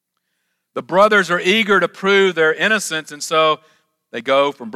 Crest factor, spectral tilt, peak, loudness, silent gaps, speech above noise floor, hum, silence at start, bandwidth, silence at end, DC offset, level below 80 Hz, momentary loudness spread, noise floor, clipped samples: 16 dB; -3.5 dB/octave; 0 dBFS; -16 LUFS; none; 56 dB; none; 0.75 s; 15 kHz; 0.05 s; under 0.1%; -68 dBFS; 13 LU; -72 dBFS; under 0.1%